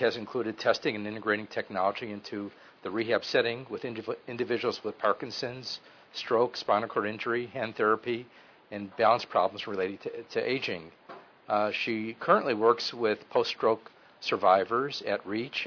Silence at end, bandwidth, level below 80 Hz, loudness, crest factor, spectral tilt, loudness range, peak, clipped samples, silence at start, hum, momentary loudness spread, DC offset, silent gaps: 0 s; 5.4 kHz; -74 dBFS; -30 LUFS; 20 dB; -5 dB/octave; 4 LU; -10 dBFS; under 0.1%; 0 s; none; 13 LU; under 0.1%; none